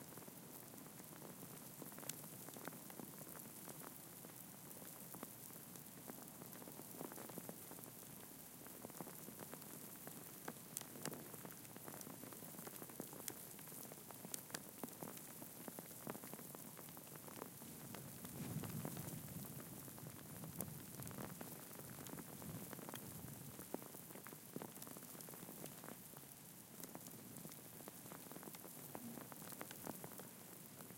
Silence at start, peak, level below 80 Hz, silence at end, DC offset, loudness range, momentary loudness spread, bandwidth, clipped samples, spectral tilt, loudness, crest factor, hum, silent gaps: 0 s; -20 dBFS; -80 dBFS; 0 s; under 0.1%; 3 LU; 5 LU; 17 kHz; under 0.1%; -4 dB/octave; -52 LUFS; 34 dB; none; none